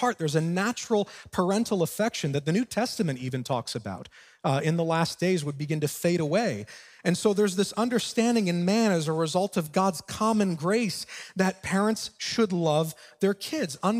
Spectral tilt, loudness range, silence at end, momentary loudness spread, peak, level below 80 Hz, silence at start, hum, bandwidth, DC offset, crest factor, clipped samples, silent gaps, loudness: -5 dB/octave; 3 LU; 0 s; 7 LU; -10 dBFS; -64 dBFS; 0 s; none; 16 kHz; under 0.1%; 16 dB; under 0.1%; none; -27 LUFS